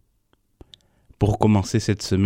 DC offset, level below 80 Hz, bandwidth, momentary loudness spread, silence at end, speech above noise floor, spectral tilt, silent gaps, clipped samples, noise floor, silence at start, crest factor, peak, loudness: under 0.1%; -42 dBFS; 13.5 kHz; 5 LU; 0 s; 46 dB; -6.5 dB/octave; none; under 0.1%; -66 dBFS; 1.2 s; 20 dB; -2 dBFS; -21 LUFS